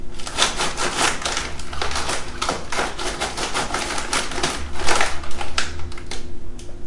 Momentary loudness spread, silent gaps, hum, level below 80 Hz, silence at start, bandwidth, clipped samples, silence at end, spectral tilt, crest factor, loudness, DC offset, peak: 13 LU; none; none; -34 dBFS; 0 s; 11.5 kHz; under 0.1%; 0 s; -2 dB/octave; 18 dB; -23 LUFS; under 0.1%; -2 dBFS